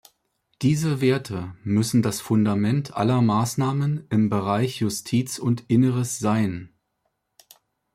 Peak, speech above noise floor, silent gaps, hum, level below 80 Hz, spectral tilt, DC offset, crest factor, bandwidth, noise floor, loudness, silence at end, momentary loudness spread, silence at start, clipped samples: -8 dBFS; 53 dB; none; none; -60 dBFS; -6.5 dB/octave; under 0.1%; 16 dB; 15.5 kHz; -75 dBFS; -23 LUFS; 1.3 s; 5 LU; 0.6 s; under 0.1%